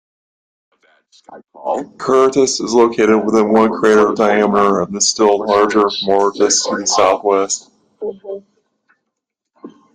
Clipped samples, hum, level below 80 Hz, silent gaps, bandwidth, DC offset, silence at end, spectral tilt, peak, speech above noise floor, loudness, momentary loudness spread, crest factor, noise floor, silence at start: under 0.1%; none; -56 dBFS; none; 9.8 kHz; under 0.1%; 0.25 s; -3 dB/octave; 0 dBFS; 63 dB; -14 LUFS; 14 LU; 14 dB; -77 dBFS; 1.3 s